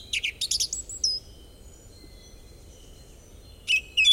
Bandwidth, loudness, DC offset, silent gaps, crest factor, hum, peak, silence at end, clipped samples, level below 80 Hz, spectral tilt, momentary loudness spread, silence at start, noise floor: 16.5 kHz; -25 LUFS; under 0.1%; none; 20 dB; none; -10 dBFS; 0 s; under 0.1%; -50 dBFS; 1.5 dB/octave; 12 LU; 0 s; -48 dBFS